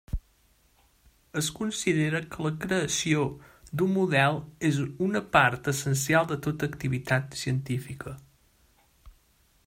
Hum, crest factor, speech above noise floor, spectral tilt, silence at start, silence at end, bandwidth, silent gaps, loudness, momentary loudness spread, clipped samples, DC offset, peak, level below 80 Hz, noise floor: none; 22 dB; 38 dB; -5 dB/octave; 0.1 s; 0.55 s; 16 kHz; none; -27 LUFS; 14 LU; under 0.1%; under 0.1%; -6 dBFS; -50 dBFS; -65 dBFS